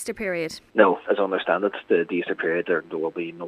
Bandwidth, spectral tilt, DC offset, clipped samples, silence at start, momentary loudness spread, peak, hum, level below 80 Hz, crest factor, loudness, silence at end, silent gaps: 14.5 kHz; -5 dB/octave; under 0.1%; under 0.1%; 0 s; 9 LU; -2 dBFS; none; -64 dBFS; 22 dB; -24 LUFS; 0 s; none